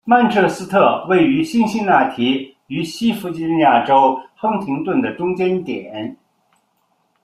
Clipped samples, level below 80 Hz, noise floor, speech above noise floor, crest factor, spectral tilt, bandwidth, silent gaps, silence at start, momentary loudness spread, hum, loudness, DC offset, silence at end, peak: under 0.1%; -58 dBFS; -64 dBFS; 48 dB; 16 dB; -6 dB/octave; 14 kHz; none; 0.05 s; 12 LU; none; -17 LUFS; under 0.1%; 1.1 s; -2 dBFS